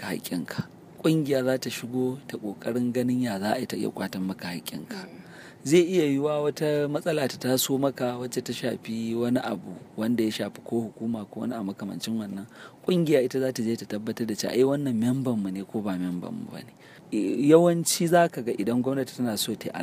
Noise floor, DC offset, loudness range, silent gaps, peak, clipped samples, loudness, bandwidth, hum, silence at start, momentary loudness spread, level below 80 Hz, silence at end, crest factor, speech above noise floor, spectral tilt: -46 dBFS; under 0.1%; 5 LU; none; -4 dBFS; under 0.1%; -27 LUFS; 15.5 kHz; none; 0 s; 14 LU; -70 dBFS; 0 s; 22 dB; 19 dB; -5 dB/octave